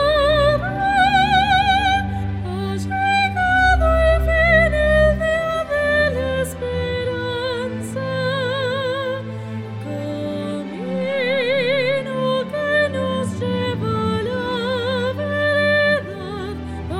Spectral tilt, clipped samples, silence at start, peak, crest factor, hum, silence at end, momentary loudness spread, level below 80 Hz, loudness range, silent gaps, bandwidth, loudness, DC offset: -5.5 dB/octave; under 0.1%; 0 s; -2 dBFS; 16 dB; none; 0 s; 11 LU; -30 dBFS; 7 LU; none; 15 kHz; -19 LUFS; under 0.1%